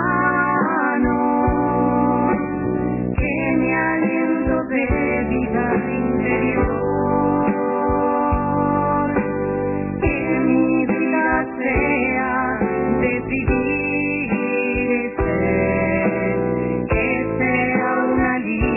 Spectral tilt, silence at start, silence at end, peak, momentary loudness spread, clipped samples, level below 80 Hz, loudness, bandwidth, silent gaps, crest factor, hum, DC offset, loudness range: -11.5 dB/octave; 0 s; 0 s; -4 dBFS; 3 LU; under 0.1%; -34 dBFS; -19 LUFS; 2.9 kHz; none; 14 dB; none; under 0.1%; 1 LU